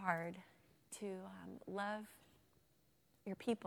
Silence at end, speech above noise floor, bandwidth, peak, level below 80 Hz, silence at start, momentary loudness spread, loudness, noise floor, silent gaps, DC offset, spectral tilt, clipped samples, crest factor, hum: 0 s; 31 dB; 19.5 kHz; -22 dBFS; -84 dBFS; 0 s; 16 LU; -47 LUFS; -76 dBFS; none; under 0.1%; -5 dB/octave; under 0.1%; 24 dB; none